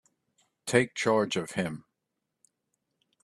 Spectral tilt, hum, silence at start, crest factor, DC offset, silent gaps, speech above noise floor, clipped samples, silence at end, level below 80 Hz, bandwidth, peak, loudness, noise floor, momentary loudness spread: -4.5 dB/octave; none; 0.65 s; 24 dB; under 0.1%; none; 56 dB; under 0.1%; 1.45 s; -70 dBFS; 13 kHz; -8 dBFS; -28 LUFS; -84 dBFS; 13 LU